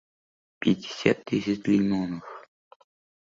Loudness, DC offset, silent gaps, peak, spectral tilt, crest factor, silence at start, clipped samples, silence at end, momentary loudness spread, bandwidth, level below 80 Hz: -26 LUFS; under 0.1%; none; -6 dBFS; -6.5 dB/octave; 22 dB; 0.6 s; under 0.1%; 0.8 s; 14 LU; 7.6 kHz; -62 dBFS